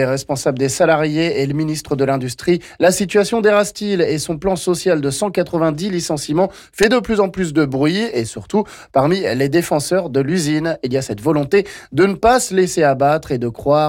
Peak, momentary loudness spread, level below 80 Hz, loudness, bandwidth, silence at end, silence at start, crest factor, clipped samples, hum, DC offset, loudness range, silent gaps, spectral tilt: -4 dBFS; 6 LU; -46 dBFS; -17 LUFS; 17 kHz; 0 s; 0 s; 12 dB; under 0.1%; none; under 0.1%; 2 LU; none; -5 dB/octave